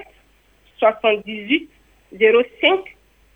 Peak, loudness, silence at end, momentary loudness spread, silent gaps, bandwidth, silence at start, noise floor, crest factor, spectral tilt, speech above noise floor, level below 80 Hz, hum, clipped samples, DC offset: -2 dBFS; -18 LUFS; 0.55 s; 6 LU; none; 3.8 kHz; 0 s; -56 dBFS; 18 dB; -5.5 dB/octave; 38 dB; -58 dBFS; none; under 0.1%; under 0.1%